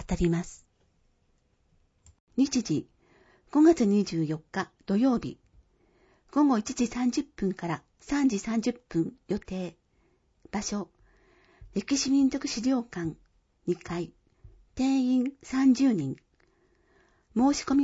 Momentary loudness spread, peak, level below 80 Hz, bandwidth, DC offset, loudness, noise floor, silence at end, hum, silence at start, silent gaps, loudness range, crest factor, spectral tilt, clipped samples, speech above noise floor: 13 LU; -10 dBFS; -52 dBFS; 8 kHz; under 0.1%; -28 LUFS; -69 dBFS; 0 s; none; 0 s; 2.20-2.27 s; 5 LU; 18 dB; -5.5 dB/octave; under 0.1%; 43 dB